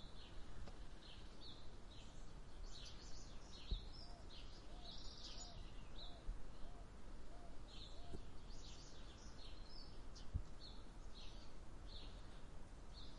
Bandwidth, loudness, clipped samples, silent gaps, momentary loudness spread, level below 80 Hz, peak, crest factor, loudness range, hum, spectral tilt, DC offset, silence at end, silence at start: 11 kHz; -58 LUFS; under 0.1%; none; 8 LU; -56 dBFS; -30 dBFS; 20 dB; 3 LU; none; -4 dB/octave; under 0.1%; 0 s; 0 s